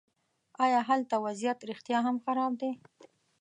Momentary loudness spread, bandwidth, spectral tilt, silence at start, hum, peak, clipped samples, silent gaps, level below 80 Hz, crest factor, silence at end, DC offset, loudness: 9 LU; 10 kHz; -4.5 dB/octave; 0.6 s; none; -16 dBFS; under 0.1%; none; -86 dBFS; 16 dB; 0.65 s; under 0.1%; -31 LUFS